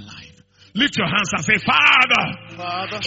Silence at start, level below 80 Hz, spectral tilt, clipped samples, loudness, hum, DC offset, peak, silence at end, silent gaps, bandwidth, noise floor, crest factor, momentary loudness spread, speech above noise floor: 0 s; -54 dBFS; -1 dB/octave; under 0.1%; -16 LUFS; none; under 0.1%; 0 dBFS; 0 s; none; 8 kHz; -49 dBFS; 18 dB; 16 LU; 31 dB